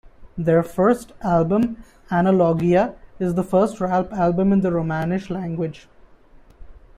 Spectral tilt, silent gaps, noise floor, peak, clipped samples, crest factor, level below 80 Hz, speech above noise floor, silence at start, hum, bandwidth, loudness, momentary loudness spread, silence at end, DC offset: -8.5 dB/octave; none; -48 dBFS; -6 dBFS; under 0.1%; 16 dB; -46 dBFS; 29 dB; 0.2 s; none; 13 kHz; -20 LUFS; 9 LU; 0.2 s; under 0.1%